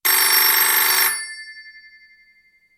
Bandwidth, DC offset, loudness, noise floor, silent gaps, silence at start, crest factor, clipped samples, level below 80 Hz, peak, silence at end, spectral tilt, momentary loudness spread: 16.5 kHz; under 0.1%; -14 LUFS; -57 dBFS; none; 0.05 s; 18 dB; under 0.1%; -78 dBFS; -2 dBFS; 1.1 s; 3.5 dB/octave; 21 LU